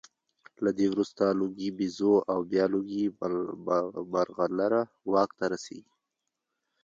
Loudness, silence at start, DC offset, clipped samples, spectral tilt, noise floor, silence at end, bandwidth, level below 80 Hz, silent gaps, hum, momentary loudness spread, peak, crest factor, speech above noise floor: -29 LUFS; 0.6 s; under 0.1%; under 0.1%; -6.5 dB/octave; -85 dBFS; 1.05 s; 7.8 kHz; -70 dBFS; none; none; 7 LU; -12 dBFS; 18 dB; 56 dB